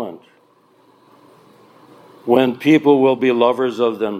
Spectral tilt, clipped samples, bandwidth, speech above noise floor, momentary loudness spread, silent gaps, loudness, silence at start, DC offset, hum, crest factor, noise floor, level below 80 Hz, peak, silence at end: -7 dB/octave; under 0.1%; 14.5 kHz; 40 dB; 8 LU; none; -15 LUFS; 0 s; under 0.1%; none; 18 dB; -54 dBFS; -70 dBFS; 0 dBFS; 0 s